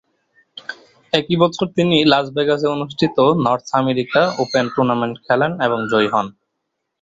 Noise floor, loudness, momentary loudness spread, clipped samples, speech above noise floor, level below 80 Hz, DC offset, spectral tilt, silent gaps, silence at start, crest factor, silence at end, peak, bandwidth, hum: -75 dBFS; -17 LUFS; 7 LU; under 0.1%; 59 dB; -56 dBFS; under 0.1%; -6 dB/octave; none; 0.55 s; 16 dB; 0.7 s; -2 dBFS; 8 kHz; none